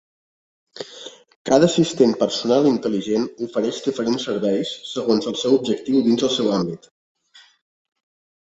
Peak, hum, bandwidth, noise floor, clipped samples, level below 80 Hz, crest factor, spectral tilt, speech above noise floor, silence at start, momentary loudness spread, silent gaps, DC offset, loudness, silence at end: -2 dBFS; none; 8.2 kHz; -41 dBFS; under 0.1%; -62 dBFS; 20 dB; -5 dB/octave; 21 dB; 0.75 s; 17 LU; 1.36-1.45 s; under 0.1%; -20 LUFS; 1.7 s